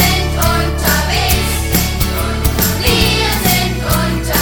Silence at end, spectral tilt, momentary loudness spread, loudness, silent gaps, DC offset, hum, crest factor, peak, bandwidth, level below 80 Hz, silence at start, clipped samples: 0 s; -4 dB/octave; 4 LU; -14 LUFS; none; under 0.1%; none; 14 dB; 0 dBFS; 19.5 kHz; -20 dBFS; 0 s; under 0.1%